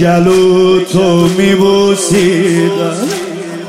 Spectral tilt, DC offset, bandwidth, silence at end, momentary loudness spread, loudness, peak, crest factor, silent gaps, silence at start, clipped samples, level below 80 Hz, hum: -5.5 dB/octave; under 0.1%; 15.5 kHz; 0 s; 8 LU; -10 LUFS; 0 dBFS; 10 dB; none; 0 s; under 0.1%; -42 dBFS; none